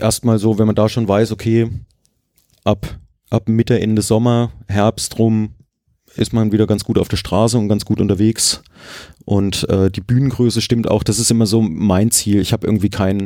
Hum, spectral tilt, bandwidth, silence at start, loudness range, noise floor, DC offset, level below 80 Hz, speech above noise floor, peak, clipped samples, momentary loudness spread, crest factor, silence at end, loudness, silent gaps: none; -5.5 dB/octave; 16.5 kHz; 0 s; 3 LU; -61 dBFS; under 0.1%; -42 dBFS; 45 dB; -2 dBFS; under 0.1%; 9 LU; 14 dB; 0 s; -16 LUFS; none